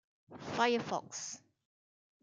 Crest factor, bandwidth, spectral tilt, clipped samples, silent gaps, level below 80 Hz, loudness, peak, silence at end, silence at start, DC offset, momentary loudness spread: 22 dB; 9.6 kHz; -3 dB/octave; under 0.1%; none; -82 dBFS; -36 LUFS; -16 dBFS; 0.85 s; 0.3 s; under 0.1%; 17 LU